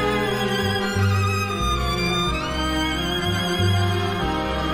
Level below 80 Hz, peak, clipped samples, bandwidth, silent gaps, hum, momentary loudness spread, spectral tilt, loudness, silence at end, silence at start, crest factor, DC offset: -34 dBFS; -10 dBFS; under 0.1%; 16 kHz; none; none; 3 LU; -5 dB/octave; -22 LUFS; 0 s; 0 s; 12 dB; under 0.1%